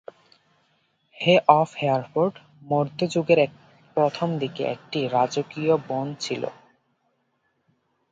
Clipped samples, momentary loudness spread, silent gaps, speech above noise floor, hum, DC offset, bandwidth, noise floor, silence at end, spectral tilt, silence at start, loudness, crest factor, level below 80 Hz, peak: under 0.1%; 10 LU; none; 49 dB; none; under 0.1%; 9 kHz; -71 dBFS; 1.6 s; -6 dB/octave; 1.15 s; -23 LUFS; 24 dB; -70 dBFS; 0 dBFS